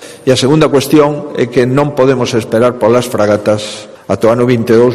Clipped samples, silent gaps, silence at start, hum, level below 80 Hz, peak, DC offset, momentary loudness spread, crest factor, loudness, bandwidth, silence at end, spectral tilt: 0.2%; none; 0 s; none; -46 dBFS; 0 dBFS; under 0.1%; 7 LU; 10 dB; -11 LUFS; 15 kHz; 0 s; -6 dB/octave